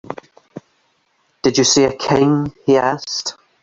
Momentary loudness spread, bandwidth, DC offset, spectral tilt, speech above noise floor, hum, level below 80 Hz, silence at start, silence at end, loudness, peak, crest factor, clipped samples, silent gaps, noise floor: 13 LU; 8 kHz; under 0.1%; -4 dB/octave; 47 dB; none; -52 dBFS; 0.1 s; 0.3 s; -16 LUFS; -2 dBFS; 16 dB; under 0.1%; none; -63 dBFS